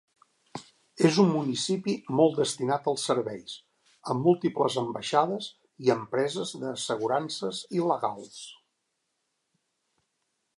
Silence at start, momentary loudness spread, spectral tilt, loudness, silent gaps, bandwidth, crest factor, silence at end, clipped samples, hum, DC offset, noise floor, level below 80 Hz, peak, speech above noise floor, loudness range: 0.55 s; 18 LU; -5 dB/octave; -27 LUFS; none; 11.5 kHz; 22 dB; 2.05 s; under 0.1%; none; under 0.1%; -79 dBFS; -76 dBFS; -8 dBFS; 52 dB; 6 LU